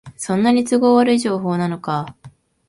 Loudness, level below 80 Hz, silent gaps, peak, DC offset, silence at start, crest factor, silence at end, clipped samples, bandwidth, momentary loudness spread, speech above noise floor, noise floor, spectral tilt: -17 LUFS; -58 dBFS; none; -2 dBFS; under 0.1%; 0.05 s; 16 dB; 0.4 s; under 0.1%; 11.5 kHz; 11 LU; 29 dB; -45 dBFS; -6 dB/octave